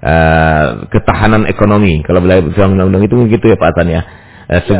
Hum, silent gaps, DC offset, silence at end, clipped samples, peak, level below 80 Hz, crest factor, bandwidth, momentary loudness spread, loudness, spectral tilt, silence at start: none; none; under 0.1%; 0 s; 0.3%; 0 dBFS; -22 dBFS; 10 dB; 4 kHz; 6 LU; -10 LUFS; -11.5 dB/octave; 0 s